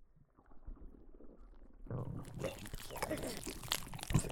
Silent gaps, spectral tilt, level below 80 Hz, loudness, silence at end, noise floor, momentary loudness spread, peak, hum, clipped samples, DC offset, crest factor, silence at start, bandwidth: none; -4.5 dB/octave; -52 dBFS; -42 LUFS; 0 s; -64 dBFS; 22 LU; -16 dBFS; none; under 0.1%; under 0.1%; 28 dB; 0 s; 19.5 kHz